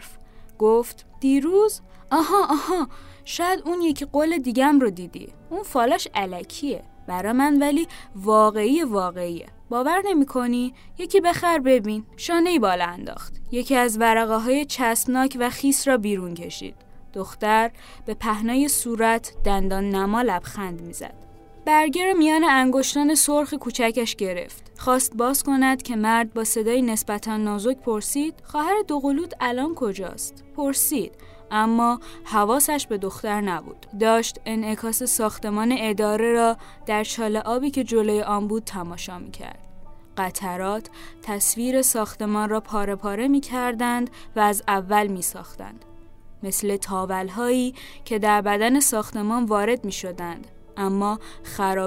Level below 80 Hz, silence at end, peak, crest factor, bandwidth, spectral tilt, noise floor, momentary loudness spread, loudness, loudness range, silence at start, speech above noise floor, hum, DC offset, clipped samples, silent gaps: -42 dBFS; 0 s; -6 dBFS; 18 dB; 16 kHz; -3.5 dB/octave; -43 dBFS; 14 LU; -22 LUFS; 4 LU; 0 s; 20 dB; none; under 0.1%; under 0.1%; none